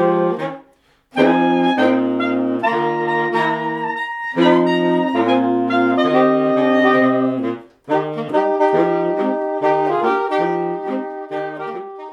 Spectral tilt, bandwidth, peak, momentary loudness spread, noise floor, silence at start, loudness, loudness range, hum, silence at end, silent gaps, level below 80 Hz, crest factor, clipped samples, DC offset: -7 dB/octave; 7.4 kHz; 0 dBFS; 11 LU; -55 dBFS; 0 s; -17 LUFS; 3 LU; none; 0 s; none; -68 dBFS; 16 dB; under 0.1%; under 0.1%